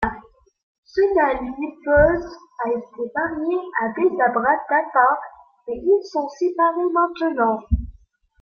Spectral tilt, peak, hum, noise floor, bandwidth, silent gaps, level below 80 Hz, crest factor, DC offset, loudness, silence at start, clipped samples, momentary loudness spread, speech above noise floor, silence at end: -8 dB/octave; -4 dBFS; none; -54 dBFS; 6.8 kHz; 0.63-0.83 s; -38 dBFS; 18 dB; under 0.1%; -21 LUFS; 0 s; under 0.1%; 11 LU; 34 dB; 0.5 s